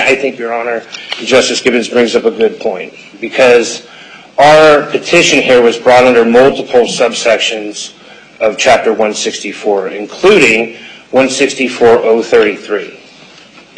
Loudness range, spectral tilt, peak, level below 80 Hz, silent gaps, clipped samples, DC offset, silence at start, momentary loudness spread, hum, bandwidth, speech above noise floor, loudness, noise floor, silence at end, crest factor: 5 LU; -3 dB/octave; 0 dBFS; -46 dBFS; none; 0.1%; under 0.1%; 0 s; 14 LU; none; 11 kHz; 28 dB; -9 LUFS; -38 dBFS; 0.8 s; 10 dB